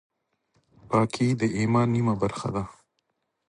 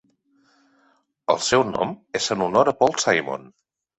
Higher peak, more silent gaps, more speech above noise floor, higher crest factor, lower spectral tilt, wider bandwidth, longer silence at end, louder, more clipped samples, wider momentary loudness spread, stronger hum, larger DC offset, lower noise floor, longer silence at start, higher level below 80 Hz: second, -6 dBFS vs -2 dBFS; neither; first, 53 dB vs 42 dB; about the same, 20 dB vs 22 dB; first, -7 dB/octave vs -3 dB/octave; first, 11 kHz vs 8.4 kHz; first, 0.75 s vs 0.6 s; second, -25 LUFS vs -21 LUFS; neither; about the same, 9 LU vs 11 LU; neither; neither; first, -77 dBFS vs -63 dBFS; second, 0.85 s vs 1.3 s; first, -54 dBFS vs -60 dBFS